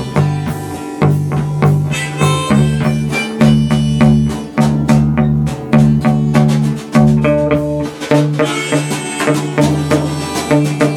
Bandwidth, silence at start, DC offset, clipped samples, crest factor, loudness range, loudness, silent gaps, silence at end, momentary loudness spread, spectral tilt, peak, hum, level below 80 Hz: 13.5 kHz; 0 s; under 0.1%; under 0.1%; 12 dB; 2 LU; -13 LUFS; none; 0 s; 6 LU; -6.5 dB/octave; 0 dBFS; none; -32 dBFS